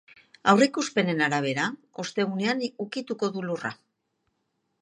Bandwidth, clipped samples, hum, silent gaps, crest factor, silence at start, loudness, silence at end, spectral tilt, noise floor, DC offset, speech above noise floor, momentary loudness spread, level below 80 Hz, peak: 10.5 kHz; under 0.1%; none; none; 24 dB; 0.45 s; -26 LUFS; 1.1 s; -4.5 dB/octave; -76 dBFS; under 0.1%; 51 dB; 12 LU; -74 dBFS; -4 dBFS